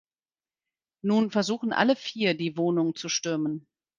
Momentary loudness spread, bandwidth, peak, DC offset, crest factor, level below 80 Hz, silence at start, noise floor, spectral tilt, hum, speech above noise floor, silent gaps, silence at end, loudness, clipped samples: 6 LU; 9.2 kHz; -6 dBFS; under 0.1%; 22 dB; -74 dBFS; 1.05 s; under -90 dBFS; -4.5 dB/octave; none; over 64 dB; none; 0.4 s; -26 LUFS; under 0.1%